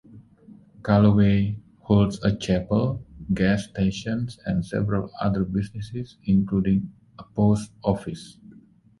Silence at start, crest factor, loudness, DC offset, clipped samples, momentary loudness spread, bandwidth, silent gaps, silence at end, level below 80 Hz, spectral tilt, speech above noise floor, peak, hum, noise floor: 0.15 s; 20 dB; -24 LUFS; under 0.1%; under 0.1%; 15 LU; 11.5 kHz; none; 0.7 s; -44 dBFS; -7.5 dB/octave; 30 dB; -4 dBFS; none; -52 dBFS